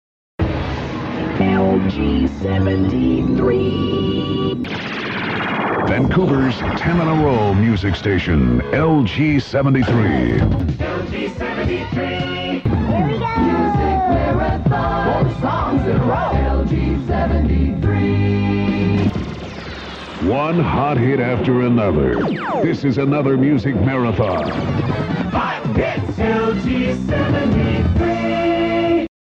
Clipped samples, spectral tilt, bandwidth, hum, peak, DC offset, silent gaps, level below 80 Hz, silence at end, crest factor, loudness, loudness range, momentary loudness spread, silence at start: under 0.1%; -8.5 dB/octave; 7.6 kHz; none; -4 dBFS; under 0.1%; none; -28 dBFS; 0.3 s; 14 dB; -18 LUFS; 3 LU; 6 LU; 0.4 s